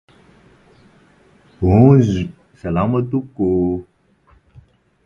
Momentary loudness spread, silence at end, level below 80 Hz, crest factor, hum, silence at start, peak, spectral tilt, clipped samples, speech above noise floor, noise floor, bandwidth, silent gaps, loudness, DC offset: 15 LU; 1.25 s; -36 dBFS; 18 dB; none; 1.6 s; 0 dBFS; -9.5 dB/octave; under 0.1%; 40 dB; -54 dBFS; 7.2 kHz; none; -16 LUFS; under 0.1%